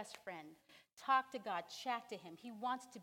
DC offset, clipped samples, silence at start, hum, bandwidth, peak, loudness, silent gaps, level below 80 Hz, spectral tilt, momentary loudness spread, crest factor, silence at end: under 0.1%; under 0.1%; 0 s; none; 17 kHz; -22 dBFS; -42 LUFS; 0.93-0.97 s; under -90 dBFS; -3 dB/octave; 16 LU; 22 dB; 0 s